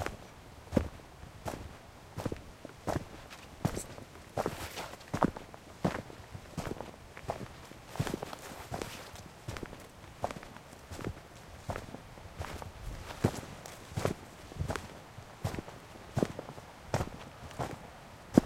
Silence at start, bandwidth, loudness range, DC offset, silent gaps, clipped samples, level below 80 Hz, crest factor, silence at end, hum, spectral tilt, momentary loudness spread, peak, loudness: 0 s; 16 kHz; 6 LU; under 0.1%; none; under 0.1%; -52 dBFS; 34 dB; 0 s; none; -6 dB/octave; 15 LU; -6 dBFS; -40 LUFS